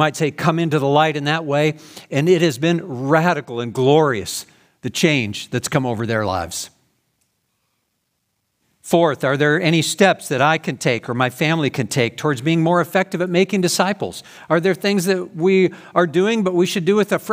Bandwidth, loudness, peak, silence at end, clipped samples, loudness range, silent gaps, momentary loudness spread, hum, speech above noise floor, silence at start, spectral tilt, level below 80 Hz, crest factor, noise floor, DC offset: 16 kHz; -18 LUFS; 0 dBFS; 0 s; under 0.1%; 5 LU; none; 8 LU; none; 54 dB; 0 s; -5 dB/octave; -60 dBFS; 18 dB; -71 dBFS; under 0.1%